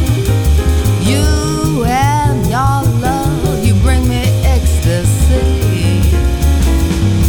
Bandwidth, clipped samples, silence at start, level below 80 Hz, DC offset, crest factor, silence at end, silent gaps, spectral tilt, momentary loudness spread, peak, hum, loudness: 19.5 kHz; under 0.1%; 0 s; -16 dBFS; under 0.1%; 10 dB; 0 s; none; -6 dB/octave; 2 LU; -2 dBFS; none; -13 LUFS